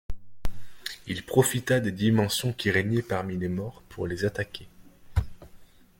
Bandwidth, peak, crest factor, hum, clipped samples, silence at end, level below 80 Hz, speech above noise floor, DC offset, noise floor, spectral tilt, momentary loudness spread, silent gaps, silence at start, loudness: 17 kHz; -6 dBFS; 22 dB; none; under 0.1%; 0.35 s; -44 dBFS; 24 dB; under 0.1%; -50 dBFS; -5 dB/octave; 18 LU; none; 0.1 s; -27 LUFS